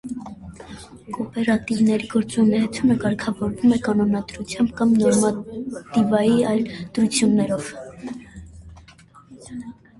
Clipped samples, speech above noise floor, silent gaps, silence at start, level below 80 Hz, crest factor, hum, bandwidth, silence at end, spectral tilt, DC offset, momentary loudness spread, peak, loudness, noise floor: under 0.1%; 29 dB; none; 0.05 s; -50 dBFS; 16 dB; none; 11.5 kHz; 0.25 s; -5.5 dB/octave; under 0.1%; 20 LU; -4 dBFS; -21 LUFS; -49 dBFS